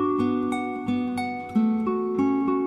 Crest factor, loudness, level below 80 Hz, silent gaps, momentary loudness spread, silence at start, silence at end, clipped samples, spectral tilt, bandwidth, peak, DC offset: 12 dB; -25 LUFS; -62 dBFS; none; 5 LU; 0 s; 0 s; under 0.1%; -7.5 dB/octave; 11 kHz; -12 dBFS; under 0.1%